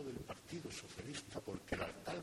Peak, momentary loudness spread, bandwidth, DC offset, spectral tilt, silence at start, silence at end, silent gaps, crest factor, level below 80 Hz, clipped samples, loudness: -26 dBFS; 5 LU; 16 kHz; under 0.1%; -4.5 dB/octave; 0 s; 0 s; none; 22 dB; -64 dBFS; under 0.1%; -47 LUFS